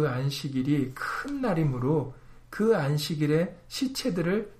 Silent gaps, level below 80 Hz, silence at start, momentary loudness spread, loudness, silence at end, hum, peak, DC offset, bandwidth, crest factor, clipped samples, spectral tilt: none; -52 dBFS; 0 s; 7 LU; -28 LUFS; 0.05 s; none; -12 dBFS; under 0.1%; 15.5 kHz; 16 dB; under 0.1%; -6.5 dB/octave